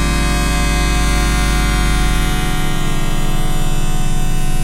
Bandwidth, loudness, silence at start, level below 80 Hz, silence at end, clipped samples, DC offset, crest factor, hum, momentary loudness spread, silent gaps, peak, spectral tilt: 16 kHz; -18 LUFS; 0 s; -14 dBFS; 0 s; under 0.1%; under 0.1%; 10 dB; none; 5 LU; none; -2 dBFS; -4 dB/octave